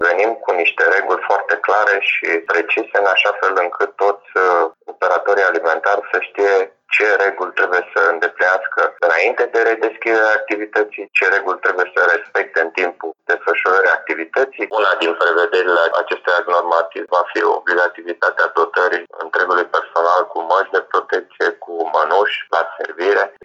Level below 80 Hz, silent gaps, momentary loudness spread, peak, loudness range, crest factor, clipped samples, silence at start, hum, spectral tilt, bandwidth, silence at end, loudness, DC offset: -84 dBFS; none; 5 LU; -2 dBFS; 2 LU; 16 dB; under 0.1%; 0 s; none; -1.5 dB/octave; 8 kHz; 0.15 s; -16 LUFS; under 0.1%